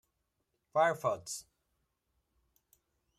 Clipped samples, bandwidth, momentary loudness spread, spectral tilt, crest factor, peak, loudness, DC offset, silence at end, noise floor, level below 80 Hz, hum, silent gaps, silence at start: under 0.1%; 15.5 kHz; 13 LU; -3.5 dB/octave; 22 dB; -16 dBFS; -34 LUFS; under 0.1%; 1.8 s; -82 dBFS; -78 dBFS; none; none; 0.75 s